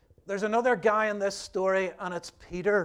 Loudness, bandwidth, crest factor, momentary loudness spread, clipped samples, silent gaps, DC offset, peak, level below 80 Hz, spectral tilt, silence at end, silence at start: -28 LUFS; 12.5 kHz; 16 dB; 12 LU; under 0.1%; none; under 0.1%; -12 dBFS; -60 dBFS; -4.5 dB/octave; 0 s; 0.25 s